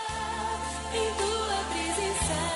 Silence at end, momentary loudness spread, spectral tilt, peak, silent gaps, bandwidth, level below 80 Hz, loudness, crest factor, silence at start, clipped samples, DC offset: 0 s; 4 LU; -3 dB/octave; -16 dBFS; none; 11.5 kHz; -44 dBFS; -29 LUFS; 14 dB; 0 s; under 0.1%; under 0.1%